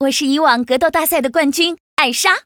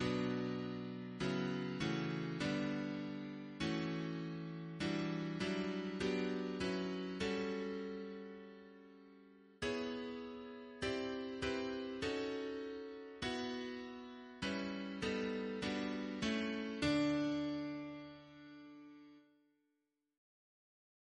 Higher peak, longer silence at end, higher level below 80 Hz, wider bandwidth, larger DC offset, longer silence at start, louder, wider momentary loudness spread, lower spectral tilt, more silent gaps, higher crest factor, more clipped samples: first, 0 dBFS vs -24 dBFS; second, 0.05 s vs 1.95 s; first, -54 dBFS vs -66 dBFS; first, over 20 kHz vs 10 kHz; neither; about the same, 0 s vs 0 s; first, -15 LUFS vs -41 LUFS; second, 3 LU vs 14 LU; second, -1 dB/octave vs -5.5 dB/octave; first, 1.80-1.97 s vs none; about the same, 16 dB vs 18 dB; neither